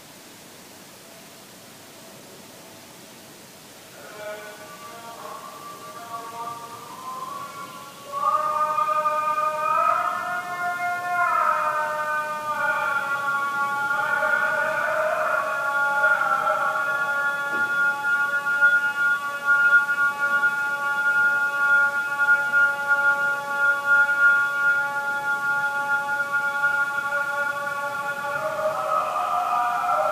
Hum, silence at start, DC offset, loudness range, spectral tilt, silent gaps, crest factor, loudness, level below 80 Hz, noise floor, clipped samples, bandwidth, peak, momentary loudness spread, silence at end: none; 0 s; under 0.1%; 17 LU; -2 dB/octave; none; 16 dB; -22 LUFS; -76 dBFS; -45 dBFS; under 0.1%; 15.5 kHz; -8 dBFS; 21 LU; 0 s